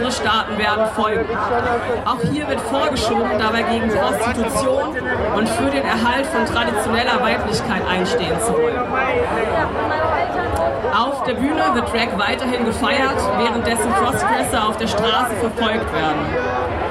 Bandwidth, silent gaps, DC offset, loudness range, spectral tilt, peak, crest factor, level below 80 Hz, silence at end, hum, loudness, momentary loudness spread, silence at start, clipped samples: 15.5 kHz; none; under 0.1%; 1 LU; -4.5 dB/octave; -2 dBFS; 16 dB; -38 dBFS; 0 s; none; -18 LUFS; 3 LU; 0 s; under 0.1%